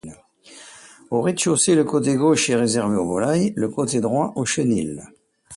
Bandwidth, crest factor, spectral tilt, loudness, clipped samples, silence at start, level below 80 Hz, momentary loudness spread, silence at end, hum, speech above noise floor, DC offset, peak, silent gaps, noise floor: 11.5 kHz; 16 dB; -4.5 dB/octave; -20 LUFS; under 0.1%; 0.05 s; -56 dBFS; 8 LU; 0 s; none; 27 dB; under 0.1%; -6 dBFS; none; -47 dBFS